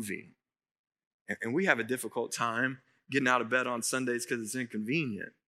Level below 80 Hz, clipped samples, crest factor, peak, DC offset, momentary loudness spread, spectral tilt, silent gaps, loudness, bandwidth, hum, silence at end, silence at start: -86 dBFS; under 0.1%; 24 dB; -8 dBFS; under 0.1%; 10 LU; -4 dB/octave; 0.71-0.84 s, 1.07-1.25 s; -31 LUFS; 16 kHz; none; 0.2 s; 0 s